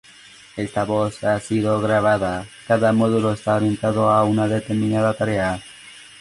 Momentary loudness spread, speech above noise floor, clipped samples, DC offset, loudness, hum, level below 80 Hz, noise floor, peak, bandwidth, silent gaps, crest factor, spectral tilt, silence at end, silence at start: 13 LU; 26 dB; under 0.1%; under 0.1%; -20 LUFS; none; -50 dBFS; -46 dBFS; -4 dBFS; 11.5 kHz; none; 16 dB; -6.5 dB/octave; 0.2 s; 0.55 s